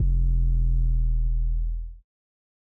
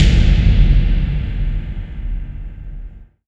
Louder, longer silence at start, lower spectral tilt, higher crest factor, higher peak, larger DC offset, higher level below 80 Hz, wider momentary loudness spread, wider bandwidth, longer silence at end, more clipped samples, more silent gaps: second, -27 LUFS vs -18 LUFS; about the same, 0 s vs 0 s; first, -12 dB/octave vs -7 dB/octave; second, 8 dB vs 14 dB; second, -14 dBFS vs 0 dBFS; neither; second, -24 dBFS vs -16 dBFS; second, 10 LU vs 20 LU; second, 0.5 kHz vs 7.6 kHz; first, 0.7 s vs 0.25 s; neither; neither